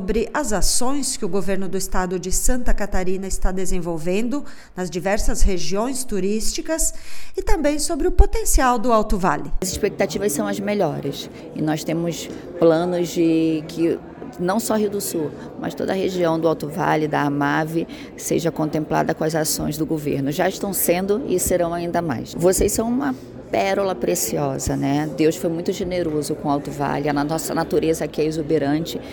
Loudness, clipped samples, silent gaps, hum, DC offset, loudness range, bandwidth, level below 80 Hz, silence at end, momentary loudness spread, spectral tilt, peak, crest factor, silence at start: -22 LUFS; under 0.1%; none; none; under 0.1%; 3 LU; 19 kHz; -28 dBFS; 0 s; 7 LU; -4.5 dB/octave; 0 dBFS; 20 dB; 0 s